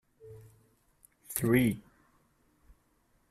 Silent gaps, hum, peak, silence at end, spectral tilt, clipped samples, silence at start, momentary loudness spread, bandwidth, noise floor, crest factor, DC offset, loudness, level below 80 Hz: none; none; -10 dBFS; 1.5 s; -6 dB/octave; under 0.1%; 0.25 s; 27 LU; 15.5 kHz; -71 dBFS; 26 dB; under 0.1%; -30 LUFS; -62 dBFS